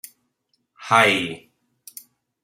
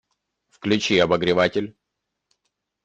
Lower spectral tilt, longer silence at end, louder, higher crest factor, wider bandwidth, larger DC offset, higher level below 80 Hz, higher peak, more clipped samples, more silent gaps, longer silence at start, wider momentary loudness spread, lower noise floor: second, -3 dB/octave vs -5 dB/octave; about the same, 1.05 s vs 1.15 s; first, -18 LUFS vs -21 LUFS; about the same, 22 dB vs 20 dB; first, 16 kHz vs 8.8 kHz; neither; second, -70 dBFS vs -58 dBFS; about the same, -2 dBFS vs -4 dBFS; neither; neither; first, 0.8 s vs 0.6 s; first, 25 LU vs 12 LU; second, -72 dBFS vs -81 dBFS